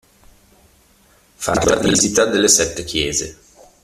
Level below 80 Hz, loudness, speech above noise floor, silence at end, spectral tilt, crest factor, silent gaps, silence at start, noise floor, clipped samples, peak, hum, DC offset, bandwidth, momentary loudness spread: -42 dBFS; -16 LUFS; 37 dB; 0.5 s; -2.5 dB/octave; 20 dB; none; 1.4 s; -53 dBFS; under 0.1%; 0 dBFS; none; under 0.1%; 16 kHz; 10 LU